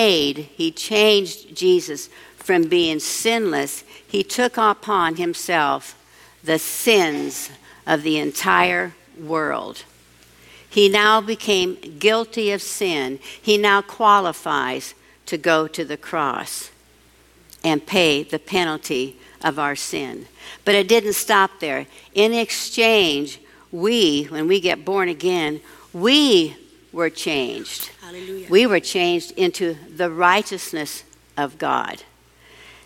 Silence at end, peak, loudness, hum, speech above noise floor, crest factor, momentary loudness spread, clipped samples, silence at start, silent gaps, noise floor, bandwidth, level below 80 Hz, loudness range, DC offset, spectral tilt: 0.85 s; 0 dBFS; -19 LUFS; none; 33 dB; 20 dB; 15 LU; under 0.1%; 0 s; none; -53 dBFS; 17 kHz; -60 dBFS; 4 LU; under 0.1%; -3 dB/octave